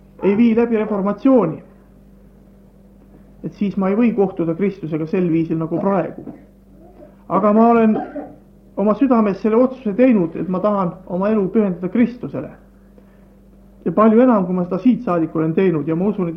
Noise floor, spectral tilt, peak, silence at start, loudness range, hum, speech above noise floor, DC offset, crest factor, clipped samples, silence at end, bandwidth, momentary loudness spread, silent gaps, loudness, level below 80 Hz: -46 dBFS; -10.5 dB/octave; -2 dBFS; 0.2 s; 5 LU; none; 30 dB; under 0.1%; 16 dB; under 0.1%; 0 s; 5.6 kHz; 15 LU; none; -17 LUFS; -50 dBFS